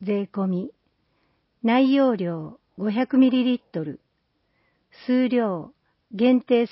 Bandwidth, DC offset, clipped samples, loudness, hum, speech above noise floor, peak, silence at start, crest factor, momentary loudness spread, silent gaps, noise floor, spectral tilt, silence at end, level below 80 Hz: 5.8 kHz; under 0.1%; under 0.1%; -22 LUFS; none; 50 dB; -8 dBFS; 0 s; 16 dB; 17 LU; none; -71 dBFS; -11 dB/octave; 0.05 s; -70 dBFS